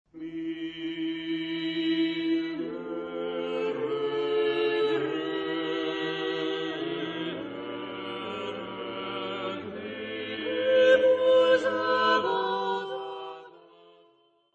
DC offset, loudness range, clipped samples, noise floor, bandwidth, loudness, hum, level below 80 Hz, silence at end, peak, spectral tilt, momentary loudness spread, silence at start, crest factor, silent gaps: under 0.1%; 10 LU; under 0.1%; -64 dBFS; 7.8 kHz; -28 LUFS; none; -70 dBFS; 0.95 s; -10 dBFS; -5.5 dB/octave; 15 LU; 0.15 s; 18 dB; none